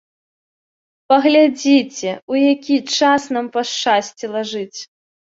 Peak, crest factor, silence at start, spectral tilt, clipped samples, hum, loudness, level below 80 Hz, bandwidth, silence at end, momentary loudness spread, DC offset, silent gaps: -2 dBFS; 16 dB; 1.1 s; -3 dB/octave; under 0.1%; none; -16 LUFS; -66 dBFS; 7.8 kHz; 0.35 s; 12 LU; under 0.1%; 2.22-2.28 s